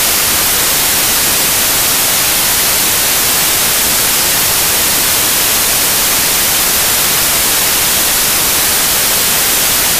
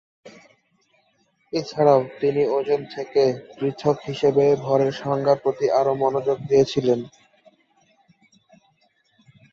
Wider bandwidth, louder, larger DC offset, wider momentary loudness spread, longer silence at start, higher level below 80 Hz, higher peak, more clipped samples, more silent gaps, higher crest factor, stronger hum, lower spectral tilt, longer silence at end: first, 16 kHz vs 7.2 kHz; first, -8 LUFS vs -21 LUFS; neither; second, 0 LU vs 8 LU; second, 0 s vs 0.25 s; first, -34 dBFS vs -62 dBFS; first, 0 dBFS vs -4 dBFS; neither; neither; second, 12 dB vs 20 dB; neither; second, 0 dB/octave vs -6.5 dB/octave; second, 0 s vs 2.45 s